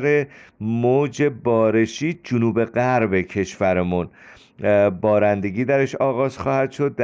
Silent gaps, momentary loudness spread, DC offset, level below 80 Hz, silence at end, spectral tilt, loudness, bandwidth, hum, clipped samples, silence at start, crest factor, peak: none; 8 LU; under 0.1%; -54 dBFS; 0 s; -7 dB/octave; -20 LUFS; 7.8 kHz; none; under 0.1%; 0 s; 14 dB; -6 dBFS